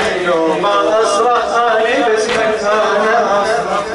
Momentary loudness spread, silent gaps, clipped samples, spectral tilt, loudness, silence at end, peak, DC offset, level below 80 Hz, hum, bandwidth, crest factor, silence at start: 2 LU; none; under 0.1%; -3 dB/octave; -13 LUFS; 0 s; -4 dBFS; under 0.1%; -48 dBFS; none; 11.5 kHz; 10 dB; 0 s